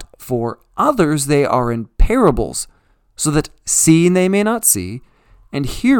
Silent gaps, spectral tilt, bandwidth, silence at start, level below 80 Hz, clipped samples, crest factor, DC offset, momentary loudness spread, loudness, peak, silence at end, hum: none; -4.5 dB/octave; 19 kHz; 0 s; -26 dBFS; under 0.1%; 16 dB; under 0.1%; 13 LU; -16 LUFS; 0 dBFS; 0 s; none